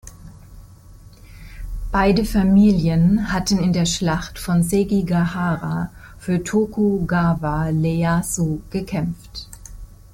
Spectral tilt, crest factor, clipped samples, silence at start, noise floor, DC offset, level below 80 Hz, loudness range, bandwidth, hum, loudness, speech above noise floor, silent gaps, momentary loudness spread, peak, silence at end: -6 dB/octave; 14 dB; under 0.1%; 0.05 s; -43 dBFS; under 0.1%; -34 dBFS; 3 LU; 16.5 kHz; none; -19 LUFS; 25 dB; none; 17 LU; -6 dBFS; 0.2 s